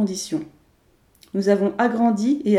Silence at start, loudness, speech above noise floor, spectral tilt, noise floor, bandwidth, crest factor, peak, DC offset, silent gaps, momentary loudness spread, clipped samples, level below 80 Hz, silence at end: 0 s; -21 LUFS; 40 dB; -6 dB/octave; -59 dBFS; 13 kHz; 16 dB; -4 dBFS; under 0.1%; none; 11 LU; under 0.1%; -64 dBFS; 0 s